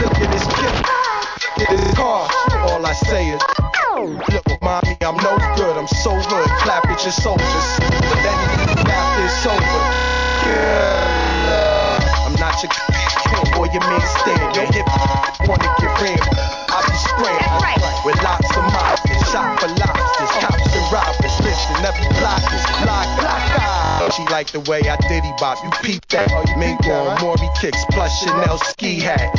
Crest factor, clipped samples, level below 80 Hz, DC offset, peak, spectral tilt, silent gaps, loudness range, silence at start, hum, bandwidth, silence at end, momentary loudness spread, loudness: 14 dB; under 0.1%; -22 dBFS; under 0.1%; -2 dBFS; -4.5 dB/octave; none; 2 LU; 0 s; none; 7.6 kHz; 0 s; 3 LU; -16 LUFS